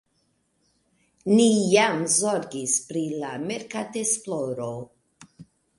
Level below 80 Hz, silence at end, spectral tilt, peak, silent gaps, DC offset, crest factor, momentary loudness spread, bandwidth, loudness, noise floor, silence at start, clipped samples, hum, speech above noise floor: -68 dBFS; 0.35 s; -3.5 dB/octave; -6 dBFS; none; under 0.1%; 20 dB; 13 LU; 11.5 kHz; -23 LUFS; -70 dBFS; 1.25 s; under 0.1%; none; 46 dB